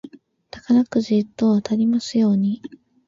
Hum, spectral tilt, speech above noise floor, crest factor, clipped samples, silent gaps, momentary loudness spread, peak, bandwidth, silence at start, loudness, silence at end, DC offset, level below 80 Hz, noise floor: none; -7 dB/octave; 25 dB; 14 dB; under 0.1%; none; 6 LU; -6 dBFS; 7.6 kHz; 0.05 s; -20 LUFS; 0.4 s; under 0.1%; -60 dBFS; -44 dBFS